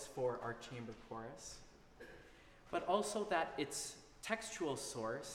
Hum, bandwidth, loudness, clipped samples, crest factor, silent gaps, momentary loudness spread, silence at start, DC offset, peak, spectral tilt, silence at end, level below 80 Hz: none; 16 kHz; -42 LUFS; under 0.1%; 22 dB; none; 20 LU; 0 s; under 0.1%; -20 dBFS; -3.5 dB/octave; 0 s; -68 dBFS